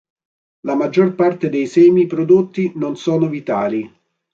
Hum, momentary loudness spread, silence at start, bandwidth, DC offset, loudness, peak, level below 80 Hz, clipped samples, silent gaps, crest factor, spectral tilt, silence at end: none; 10 LU; 0.65 s; 7.4 kHz; under 0.1%; -16 LUFS; -2 dBFS; -62 dBFS; under 0.1%; none; 14 dB; -8 dB/octave; 0.45 s